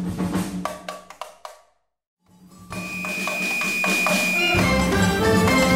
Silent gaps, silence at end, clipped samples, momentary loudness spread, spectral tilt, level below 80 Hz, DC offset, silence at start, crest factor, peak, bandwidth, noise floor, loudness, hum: 2.07-2.17 s; 0 s; under 0.1%; 19 LU; -4.5 dB/octave; -40 dBFS; under 0.1%; 0 s; 16 dB; -6 dBFS; 16 kHz; -61 dBFS; -20 LUFS; none